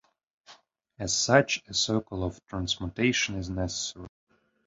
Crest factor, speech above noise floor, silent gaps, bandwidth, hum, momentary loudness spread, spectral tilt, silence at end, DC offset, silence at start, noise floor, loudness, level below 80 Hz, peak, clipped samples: 26 dB; 29 dB; none; 8.2 kHz; none; 13 LU; -3.5 dB/octave; 0.6 s; under 0.1%; 0.5 s; -57 dBFS; -28 LUFS; -48 dBFS; -4 dBFS; under 0.1%